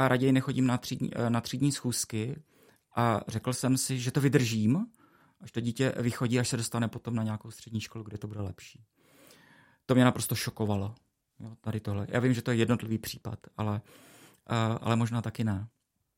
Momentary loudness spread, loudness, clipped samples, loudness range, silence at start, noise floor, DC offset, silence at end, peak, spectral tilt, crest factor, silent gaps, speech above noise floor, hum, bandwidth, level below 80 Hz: 14 LU; -30 LUFS; under 0.1%; 4 LU; 0 s; -61 dBFS; under 0.1%; 0.5 s; -10 dBFS; -5.5 dB/octave; 20 dB; none; 31 dB; none; 16.5 kHz; -64 dBFS